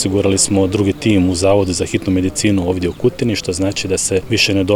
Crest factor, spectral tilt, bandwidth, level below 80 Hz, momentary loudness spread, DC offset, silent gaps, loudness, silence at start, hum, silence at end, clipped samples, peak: 14 dB; -4.5 dB/octave; 17 kHz; -40 dBFS; 5 LU; under 0.1%; none; -15 LUFS; 0 s; none; 0 s; under 0.1%; -2 dBFS